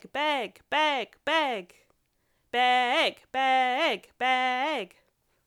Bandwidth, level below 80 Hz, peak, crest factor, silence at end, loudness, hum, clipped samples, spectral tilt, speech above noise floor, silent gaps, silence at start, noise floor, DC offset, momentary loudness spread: 16.5 kHz; -74 dBFS; -12 dBFS; 16 dB; 0.6 s; -26 LUFS; none; under 0.1%; -2 dB/octave; 45 dB; none; 0.15 s; -72 dBFS; under 0.1%; 8 LU